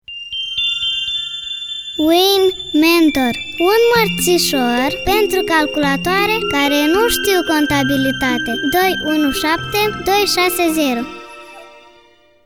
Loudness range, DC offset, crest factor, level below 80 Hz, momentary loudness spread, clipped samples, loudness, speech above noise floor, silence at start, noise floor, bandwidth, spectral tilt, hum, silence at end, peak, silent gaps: 2 LU; 0.4%; 16 dB; -42 dBFS; 9 LU; under 0.1%; -15 LUFS; 35 dB; 0.1 s; -50 dBFS; over 20 kHz; -3 dB/octave; none; 0.65 s; 0 dBFS; none